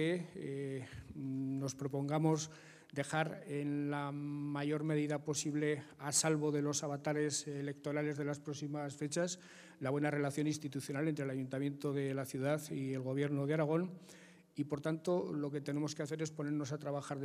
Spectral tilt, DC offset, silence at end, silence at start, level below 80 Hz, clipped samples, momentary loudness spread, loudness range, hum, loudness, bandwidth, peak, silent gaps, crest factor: -5 dB/octave; under 0.1%; 0 s; 0 s; -76 dBFS; under 0.1%; 8 LU; 3 LU; none; -38 LUFS; 15.5 kHz; -18 dBFS; none; 20 dB